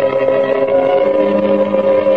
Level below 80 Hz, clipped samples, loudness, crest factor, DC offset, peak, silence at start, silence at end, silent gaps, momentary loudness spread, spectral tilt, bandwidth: -52 dBFS; under 0.1%; -13 LUFS; 10 dB; 0.6%; -2 dBFS; 0 s; 0 s; none; 1 LU; -8 dB/octave; 5 kHz